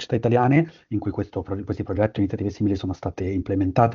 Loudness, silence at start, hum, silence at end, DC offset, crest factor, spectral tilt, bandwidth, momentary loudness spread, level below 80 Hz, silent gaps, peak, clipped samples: -24 LUFS; 0 s; none; 0 s; under 0.1%; 20 dB; -7.5 dB/octave; 7.2 kHz; 10 LU; -48 dBFS; none; -2 dBFS; under 0.1%